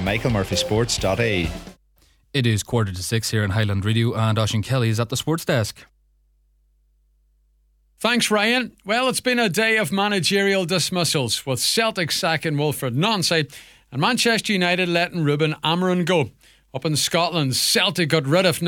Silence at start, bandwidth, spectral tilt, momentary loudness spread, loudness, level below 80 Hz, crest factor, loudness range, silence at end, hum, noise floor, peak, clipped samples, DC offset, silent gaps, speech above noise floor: 0 s; 18 kHz; -4 dB/octave; 5 LU; -20 LUFS; -46 dBFS; 18 dB; 5 LU; 0 s; none; -62 dBFS; -4 dBFS; under 0.1%; under 0.1%; none; 41 dB